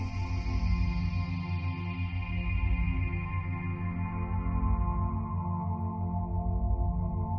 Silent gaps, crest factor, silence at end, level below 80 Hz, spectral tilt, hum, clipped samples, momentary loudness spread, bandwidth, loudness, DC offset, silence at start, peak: none; 12 dB; 0 s; -34 dBFS; -7.5 dB/octave; none; under 0.1%; 4 LU; 6.2 kHz; -32 LUFS; under 0.1%; 0 s; -18 dBFS